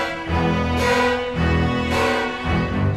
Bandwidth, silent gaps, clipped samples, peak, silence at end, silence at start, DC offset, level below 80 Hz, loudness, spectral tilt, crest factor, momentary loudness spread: 14 kHz; none; under 0.1%; -6 dBFS; 0 s; 0 s; under 0.1%; -32 dBFS; -20 LUFS; -6 dB/octave; 14 dB; 4 LU